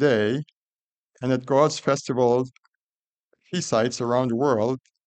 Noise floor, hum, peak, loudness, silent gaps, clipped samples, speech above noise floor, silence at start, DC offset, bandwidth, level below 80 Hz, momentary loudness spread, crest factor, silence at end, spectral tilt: under -90 dBFS; none; -6 dBFS; -23 LUFS; 0.53-1.03 s, 2.58-3.31 s; under 0.1%; over 68 dB; 0 s; under 0.1%; 9.2 kHz; -66 dBFS; 11 LU; 18 dB; 0.3 s; -5.5 dB/octave